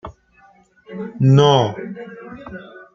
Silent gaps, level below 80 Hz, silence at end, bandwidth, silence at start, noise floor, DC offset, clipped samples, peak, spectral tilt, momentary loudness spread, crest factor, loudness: none; -54 dBFS; 0.3 s; 7.2 kHz; 0.05 s; -52 dBFS; under 0.1%; under 0.1%; -2 dBFS; -7 dB/octave; 24 LU; 18 dB; -15 LUFS